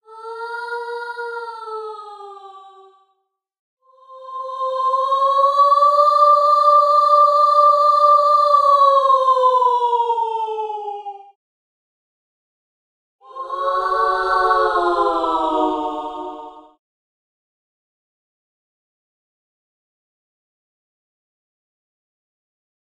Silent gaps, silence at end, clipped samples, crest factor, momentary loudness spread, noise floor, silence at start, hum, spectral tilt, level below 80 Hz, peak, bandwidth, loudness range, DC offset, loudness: 3.59-3.77 s, 11.35-13.19 s; 6.2 s; under 0.1%; 16 dB; 18 LU; -70 dBFS; 0.1 s; none; -2.5 dB/octave; -58 dBFS; -4 dBFS; 11 kHz; 19 LU; under 0.1%; -15 LUFS